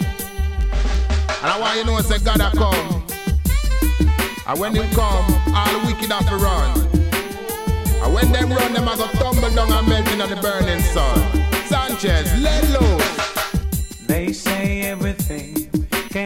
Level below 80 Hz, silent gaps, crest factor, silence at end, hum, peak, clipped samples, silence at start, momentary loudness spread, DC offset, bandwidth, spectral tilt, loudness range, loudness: -20 dBFS; none; 16 dB; 0 s; none; -2 dBFS; under 0.1%; 0 s; 6 LU; under 0.1%; 17 kHz; -5 dB/octave; 1 LU; -19 LUFS